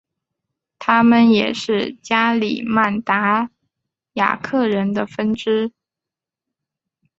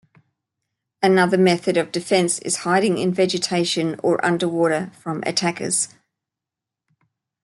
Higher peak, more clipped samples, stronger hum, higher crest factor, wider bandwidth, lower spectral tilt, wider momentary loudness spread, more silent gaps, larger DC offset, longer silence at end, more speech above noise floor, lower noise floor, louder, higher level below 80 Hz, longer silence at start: about the same, -2 dBFS vs -4 dBFS; neither; neither; about the same, 18 dB vs 18 dB; second, 7.8 kHz vs 12 kHz; first, -6 dB/octave vs -4 dB/octave; first, 9 LU vs 6 LU; neither; neither; about the same, 1.5 s vs 1.55 s; about the same, 70 dB vs 67 dB; about the same, -87 dBFS vs -86 dBFS; about the same, -18 LUFS vs -20 LUFS; first, -60 dBFS vs -66 dBFS; second, 0.8 s vs 1 s